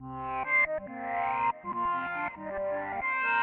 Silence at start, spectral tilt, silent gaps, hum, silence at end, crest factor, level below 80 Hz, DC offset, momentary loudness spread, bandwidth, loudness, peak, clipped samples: 0 s; -2.5 dB/octave; none; none; 0 s; 14 dB; -60 dBFS; under 0.1%; 10 LU; 4.8 kHz; -30 LUFS; -16 dBFS; under 0.1%